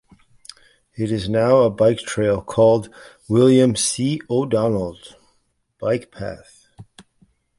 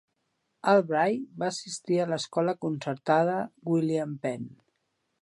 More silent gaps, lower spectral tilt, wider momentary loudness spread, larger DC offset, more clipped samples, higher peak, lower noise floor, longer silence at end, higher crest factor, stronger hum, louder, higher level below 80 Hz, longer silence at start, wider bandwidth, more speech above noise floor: neither; about the same, -5.5 dB/octave vs -5.5 dB/octave; first, 16 LU vs 10 LU; neither; neither; first, -4 dBFS vs -10 dBFS; second, -66 dBFS vs -78 dBFS; second, 0.6 s vs 0.75 s; about the same, 16 dB vs 20 dB; neither; first, -18 LUFS vs -28 LUFS; first, -50 dBFS vs -78 dBFS; first, 1 s vs 0.65 s; about the same, 11.5 kHz vs 11.5 kHz; about the same, 48 dB vs 50 dB